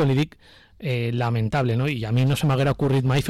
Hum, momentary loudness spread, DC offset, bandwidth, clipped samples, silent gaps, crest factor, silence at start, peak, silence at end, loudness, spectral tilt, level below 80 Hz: none; 6 LU; under 0.1%; 13 kHz; under 0.1%; none; 8 dB; 0 s; -14 dBFS; 0 s; -23 LUFS; -7 dB/octave; -46 dBFS